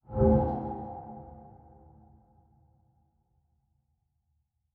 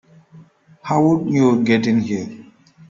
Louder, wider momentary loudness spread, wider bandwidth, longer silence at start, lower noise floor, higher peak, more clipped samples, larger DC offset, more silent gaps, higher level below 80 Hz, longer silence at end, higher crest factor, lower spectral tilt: second, -28 LUFS vs -17 LUFS; first, 25 LU vs 13 LU; second, 2.5 kHz vs 7.6 kHz; second, 0.1 s vs 0.35 s; first, -77 dBFS vs -47 dBFS; second, -12 dBFS vs -4 dBFS; neither; neither; neither; first, -44 dBFS vs -58 dBFS; first, 3.25 s vs 0.45 s; first, 22 dB vs 16 dB; first, -12 dB/octave vs -7 dB/octave